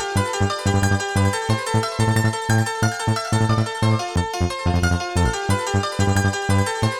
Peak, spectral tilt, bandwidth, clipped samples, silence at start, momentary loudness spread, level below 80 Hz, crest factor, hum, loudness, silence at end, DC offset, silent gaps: -6 dBFS; -5 dB/octave; 15.5 kHz; under 0.1%; 0 s; 3 LU; -36 dBFS; 14 dB; none; -21 LUFS; 0 s; 0.5%; none